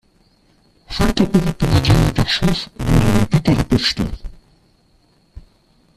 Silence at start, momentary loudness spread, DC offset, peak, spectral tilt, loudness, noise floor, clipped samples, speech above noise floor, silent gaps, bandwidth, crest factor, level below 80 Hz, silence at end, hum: 0.9 s; 8 LU; under 0.1%; -2 dBFS; -6 dB/octave; -17 LUFS; -56 dBFS; under 0.1%; 41 dB; none; 14.5 kHz; 16 dB; -28 dBFS; 0.55 s; none